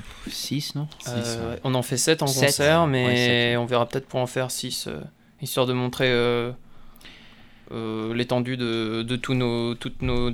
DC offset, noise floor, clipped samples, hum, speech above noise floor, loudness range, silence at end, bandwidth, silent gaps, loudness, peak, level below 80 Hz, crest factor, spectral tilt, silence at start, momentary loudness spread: under 0.1%; -48 dBFS; under 0.1%; none; 24 dB; 6 LU; 0 s; 18.5 kHz; none; -24 LUFS; -6 dBFS; -42 dBFS; 18 dB; -4.5 dB/octave; 0 s; 13 LU